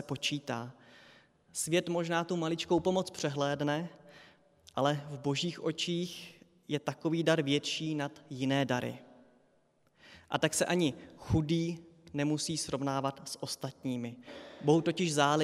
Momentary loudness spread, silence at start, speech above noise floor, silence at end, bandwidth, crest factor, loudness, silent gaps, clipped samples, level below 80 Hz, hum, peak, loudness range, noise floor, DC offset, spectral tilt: 13 LU; 0 s; 38 dB; 0 s; 15.5 kHz; 22 dB; -33 LUFS; none; under 0.1%; -62 dBFS; none; -12 dBFS; 2 LU; -70 dBFS; under 0.1%; -4.5 dB/octave